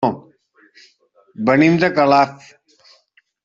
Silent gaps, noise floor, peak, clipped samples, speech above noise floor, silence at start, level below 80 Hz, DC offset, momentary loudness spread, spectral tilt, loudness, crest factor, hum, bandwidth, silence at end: none; -58 dBFS; -2 dBFS; under 0.1%; 44 dB; 0 s; -58 dBFS; under 0.1%; 9 LU; -7 dB/octave; -15 LUFS; 16 dB; none; 7.6 kHz; 1.1 s